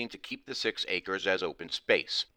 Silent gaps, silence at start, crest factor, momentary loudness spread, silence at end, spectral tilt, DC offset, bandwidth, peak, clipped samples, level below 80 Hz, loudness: none; 0 s; 22 dB; 10 LU; 0.1 s; -2.5 dB/octave; under 0.1%; 16 kHz; -10 dBFS; under 0.1%; -68 dBFS; -31 LUFS